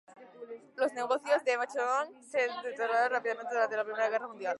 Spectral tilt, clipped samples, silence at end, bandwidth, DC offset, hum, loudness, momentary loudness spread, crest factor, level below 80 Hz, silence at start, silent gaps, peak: -2.5 dB/octave; under 0.1%; 0 s; 11.5 kHz; under 0.1%; none; -31 LUFS; 6 LU; 16 dB; under -90 dBFS; 0.1 s; none; -16 dBFS